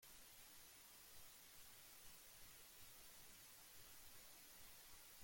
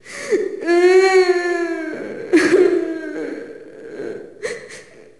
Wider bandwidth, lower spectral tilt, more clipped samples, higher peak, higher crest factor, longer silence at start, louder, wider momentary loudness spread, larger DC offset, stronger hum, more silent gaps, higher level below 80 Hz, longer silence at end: first, 17 kHz vs 11.5 kHz; second, -0.5 dB/octave vs -4 dB/octave; neither; second, -48 dBFS vs -4 dBFS; about the same, 14 dB vs 14 dB; about the same, 0 s vs 0.05 s; second, -61 LUFS vs -17 LUFS; second, 1 LU vs 21 LU; second, under 0.1% vs 0.2%; neither; neither; second, -78 dBFS vs -60 dBFS; second, 0 s vs 0.2 s